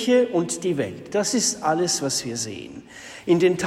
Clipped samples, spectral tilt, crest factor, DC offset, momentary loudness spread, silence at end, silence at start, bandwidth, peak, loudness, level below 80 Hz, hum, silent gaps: under 0.1%; -3.5 dB/octave; 16 dB; under 0.1%; 17 LU; 0 s; 0 s; 15.5 kHz; -8 dBFS; -23 LUFS; -62 dBFS; none; none